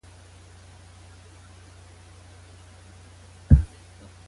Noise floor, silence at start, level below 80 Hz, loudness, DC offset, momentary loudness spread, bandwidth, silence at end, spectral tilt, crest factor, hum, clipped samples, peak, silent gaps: -49 dBFS; 3.5 s; -32 dBFS; -22 LUFS; under 0.1%; 29 LU; 11.5 kHz; 0.65 s; -8 dB/octave; 26 dB; none; under 0.1%; -2 dBFS; none